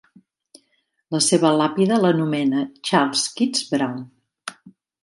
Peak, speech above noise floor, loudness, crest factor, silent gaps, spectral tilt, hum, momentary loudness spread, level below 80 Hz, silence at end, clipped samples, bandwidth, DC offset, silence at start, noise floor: -2 dBFS; 49 dB; -20 LUFS; 18 dB; none; -4 dB/octave; none; 19 LU; -70 dBFS; 0.35 s; under 0.1%; 11.5 kHz; under 0.1%; 1.1 s; -69 dBFS